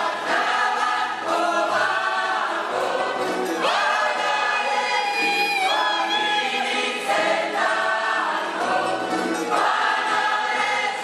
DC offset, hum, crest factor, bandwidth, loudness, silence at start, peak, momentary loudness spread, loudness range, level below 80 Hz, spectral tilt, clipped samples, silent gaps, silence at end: under 0.1%; none; 14 dB; 14 kHz; -21 LUFS; 0 s; -8 dBFS; 4 LU; 1 LU; -74 dBFS; -1.5 dB/octave; under 0.1%; none; 0 s